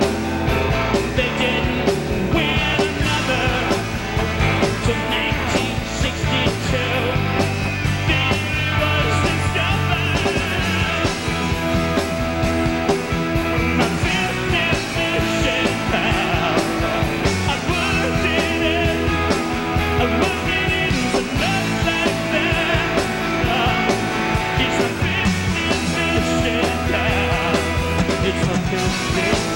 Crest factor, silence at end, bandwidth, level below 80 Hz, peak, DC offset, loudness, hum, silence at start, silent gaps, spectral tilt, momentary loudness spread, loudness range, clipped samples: 16 dB; 0 s; 16.5 kHz; -30 dBFS; -4 dBFS; under 0.1%; -19 LUFS; none; 0 s; none; -5 dB/octave; 3 LU; 1 LU; under 0.1%